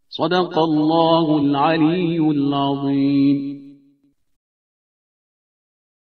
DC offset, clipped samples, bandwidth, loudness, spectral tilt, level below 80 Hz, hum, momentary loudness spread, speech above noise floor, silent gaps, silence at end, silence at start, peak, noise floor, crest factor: under 0.1%; under 0.1%; 6.2 kHz; -18 LUFS; -8.5 dB/octave; -62 dBFS; none; 5 LU; 42 dB; none; 2.35 s; 0.1 s; -2 dBFS; -60 dBFS; 16 dB